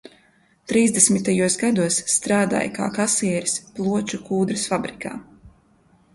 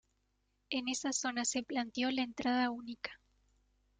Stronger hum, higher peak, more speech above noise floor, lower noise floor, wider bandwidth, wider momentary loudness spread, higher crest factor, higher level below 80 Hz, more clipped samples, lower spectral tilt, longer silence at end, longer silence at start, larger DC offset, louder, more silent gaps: neither; first, 0 dBFS vs -20 dBFS; second, 38 dB vs 43 dB; second, -59 dBFS vs -79 dBFS; first, 11.5 kHz vs 9.6 kHz; about the same, 10 LU vs 10 LU; about the same, 22 dB vs 18 dB; first, -58 dBFS vs -72 dBFS; neither; first, -3.5 dB/octave vs -1.5 dB/octave; second, 0.65 s vs 0.85 s; about the same, 0.7 s vs 0.7 s; neither; first, -20 LUFS vs -36 LUFS; neither